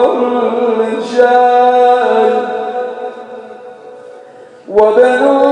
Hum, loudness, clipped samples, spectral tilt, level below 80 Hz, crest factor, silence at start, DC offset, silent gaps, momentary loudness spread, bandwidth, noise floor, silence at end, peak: none; -11 LUFS; 0.3%; -5 dB/octave; -56 dBFS; 12 dB; 0 s; under 0.1%; none; 20 LU; 9.4 kHz; -36 dBFS; 0 s; 0 dBFS